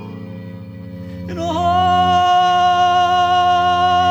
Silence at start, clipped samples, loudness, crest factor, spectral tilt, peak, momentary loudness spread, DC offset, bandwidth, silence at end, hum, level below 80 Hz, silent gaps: 0 s; under 0.1%; -14 LUFS; 12 dB; -5 dB/octave; -4 dBFS; 19 LU; under 0.1%; 8 kHz; 0 s; none; -46 dBFS; none